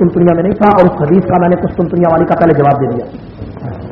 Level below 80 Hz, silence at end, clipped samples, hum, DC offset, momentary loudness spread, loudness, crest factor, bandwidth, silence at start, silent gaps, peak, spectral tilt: -36 dBFS; 0 s; 0.3%; none; under 0.1%; 16 LU; -10 LUFS; 10 dB; 5.2 kHz; 0 s; none; 0 dBFS; -11 dB/octave